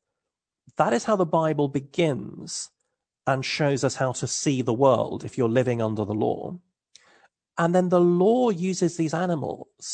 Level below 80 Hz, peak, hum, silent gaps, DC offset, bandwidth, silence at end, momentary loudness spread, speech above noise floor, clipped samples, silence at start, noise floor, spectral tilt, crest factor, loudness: -66 dBFS; -6 dBFS; none; none; under 0.1%; 9.4 kHz; 0 s; 13 LU; 63 dB; under 0.1%; 0.8 s; -86 dBFS; -5.5 dB/octave; 18 dB; -24 LUFS